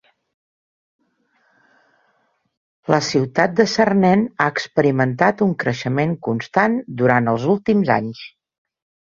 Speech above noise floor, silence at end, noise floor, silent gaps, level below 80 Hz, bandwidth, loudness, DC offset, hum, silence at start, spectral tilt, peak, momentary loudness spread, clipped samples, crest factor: 48 dB; 0.9 s; -65 dBFS; none; -58 dBFS; 7.4 kHz; -18 LUFS; under 0.1%; none; 2.9 s; -6 dB/octave; 0 dBFS; 6 LU; under 0.1%; 18 dB